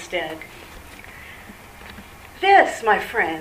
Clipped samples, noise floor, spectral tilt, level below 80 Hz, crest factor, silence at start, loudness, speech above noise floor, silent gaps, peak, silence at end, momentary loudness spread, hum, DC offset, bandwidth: under 0.1%; -41 dBFS; -3.5 dB/octave; -50 dBFS; 20 dB; 0 s; -18 LUFS; 22 dB; none; -2 dBFS; 0 s; 26 LU; none; under 0.1%; 15.5 kHz